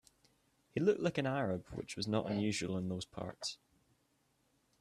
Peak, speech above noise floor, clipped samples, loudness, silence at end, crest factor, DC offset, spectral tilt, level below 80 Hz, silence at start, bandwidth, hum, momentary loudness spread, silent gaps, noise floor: -20 dBFS; 40 dB; under 0.1%; -38 LUFS; 1.25 s; 20 dB; under 0.1%; -5.5 dB/octave; -68 dBFS; 0.75 s; 13 kHz; none; 11 LU; none; -77 dBFS